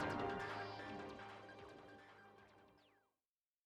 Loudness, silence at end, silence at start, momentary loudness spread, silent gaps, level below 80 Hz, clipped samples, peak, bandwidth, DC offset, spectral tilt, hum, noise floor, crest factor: -49 LUFS; 0.75 s; 0 s; 21 LU; none; -72 dBFS; under 0.1%; -32 dBFS; 13 kHz; under 0.1%; -5.5 dB/octave; none; under -90 dBFS; 20 dB